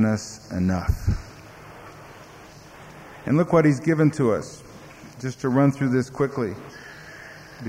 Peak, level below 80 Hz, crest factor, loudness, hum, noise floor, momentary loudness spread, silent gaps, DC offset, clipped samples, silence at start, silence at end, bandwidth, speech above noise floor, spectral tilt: -8 dBFS; -40 dBFS; 18 dB; -23 LUFS; none; -45 dBFS; 24 LU; none; under 0.1%; under 0.1%; 0 s; 0 s; 15.5 kHz; 23 dB; -7.5 dB/octave